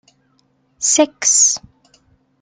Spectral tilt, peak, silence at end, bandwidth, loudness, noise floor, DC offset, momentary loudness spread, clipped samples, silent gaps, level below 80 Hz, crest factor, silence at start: 0.5 dB/octave; -2 dBFS; 0.85 s; 11 kHz; -13 LUFS; -61 dBFS; under 0.1%; 9 LU; under 0.1%; none; -62 dBFS; 18 dB; 0.8 s